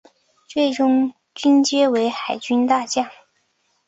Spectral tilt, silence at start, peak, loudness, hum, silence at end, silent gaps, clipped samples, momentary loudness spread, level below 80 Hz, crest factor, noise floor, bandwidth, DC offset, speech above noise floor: -3 dB/octave; 0.5 s; -4 dBFS; -19 LUFS; none; 0.75 s; none; under 0.1%; 10 LU; -66 dBFS; 16 dB; -67 dBFS; 8 kHz; under 0.1%; 49 dB